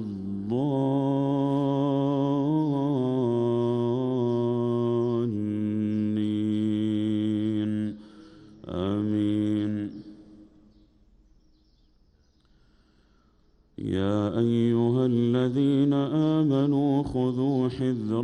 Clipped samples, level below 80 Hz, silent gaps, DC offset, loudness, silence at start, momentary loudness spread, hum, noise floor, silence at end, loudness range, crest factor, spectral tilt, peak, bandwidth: under 0.1%; -58 dBFS; none; under 0.1%; -26 LUFS; 0 s; 7 LU; none; -62 dBFS; 0 s; 8 LU; 12 dB; -9 dB/octave; -14 dBFS; 8.8 kHz